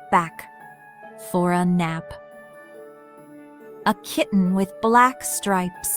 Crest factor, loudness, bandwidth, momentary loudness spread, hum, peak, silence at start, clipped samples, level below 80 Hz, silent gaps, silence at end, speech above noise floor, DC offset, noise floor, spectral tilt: 18 dB; -21 LUFS; over 20 kHz; 26 LU; none; -4 dBFS; 0 s; under 0.1%; -58 dBFS; none; 0 s; 24 dB; under 0.1%; -45 dBFS; -5 dB/octave